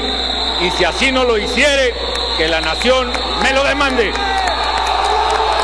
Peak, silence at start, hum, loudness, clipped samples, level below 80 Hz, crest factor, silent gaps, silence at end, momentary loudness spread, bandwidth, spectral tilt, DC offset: 0 dBFS; 0 s; none; -14 LUFS; under 0.1%; -28 dBFS; 14 dB; none; 0 s; 3 LU; 11 kHz; -3 dB/octave; 1%